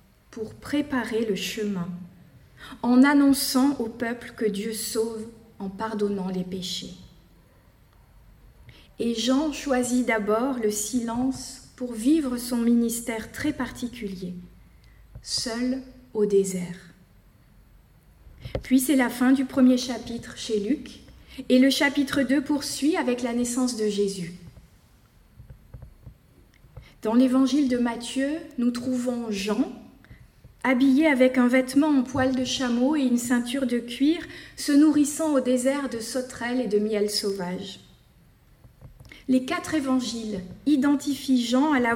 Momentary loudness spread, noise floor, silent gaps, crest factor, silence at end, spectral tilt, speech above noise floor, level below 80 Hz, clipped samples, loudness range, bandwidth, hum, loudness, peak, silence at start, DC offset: 16 LU; -56 dBFS; none; 18 dB; 0 s; -4 dB/octave; 33 dB; -54 dBFS; under 0.1%; 7 LU; 17 kHz; none; -24 LUFS; -8 dBFS; 0.3 s; under 0.1%